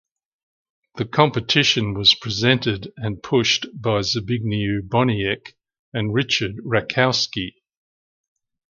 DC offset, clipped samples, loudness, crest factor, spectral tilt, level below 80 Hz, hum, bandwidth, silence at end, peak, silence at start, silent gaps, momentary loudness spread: under 0.1%; under 0.1%; -20 LUFS; 22 dB; -4.5 dB/octave; -50 dBFS; none; 7.4 kHz; 1.25 s; 0 dBFS; 0.95 s; 5.79-5.92 s; 12 LU